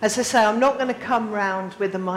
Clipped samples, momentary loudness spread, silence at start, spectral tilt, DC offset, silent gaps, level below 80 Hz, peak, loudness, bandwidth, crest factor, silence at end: under 0.1%; 8 LU; 0 s; -3.5 dB/octave; under 0.1%; none; -60 dBFS; -8 dBFS; -21 LUFS; 16 kHz; 12 dB; 0 s